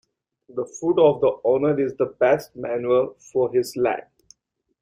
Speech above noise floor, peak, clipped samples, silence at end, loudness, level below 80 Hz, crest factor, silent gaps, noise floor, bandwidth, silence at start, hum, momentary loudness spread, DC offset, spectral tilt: 51 dB; -6 dBFS; under 0.1%; 0.8 s; -22 LUFS; -62 dBFS; 18 dB; none; -72 dBFS; 16 kHz; 0.55 s; none; 12 LU; under 0.1%; -6 dB/octave